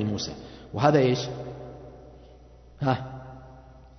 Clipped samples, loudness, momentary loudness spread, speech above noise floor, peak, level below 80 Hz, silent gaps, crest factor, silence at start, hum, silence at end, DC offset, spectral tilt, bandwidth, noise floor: under 0.1%; -26 LUFS; 24 LU; 26 dB; -6 dBFS; -52 dBFS; none; 22 dB; 0 s; none; 0.1 s; under 0.1%; -6 dB/octave; 6.4 kHz; -50 dBFS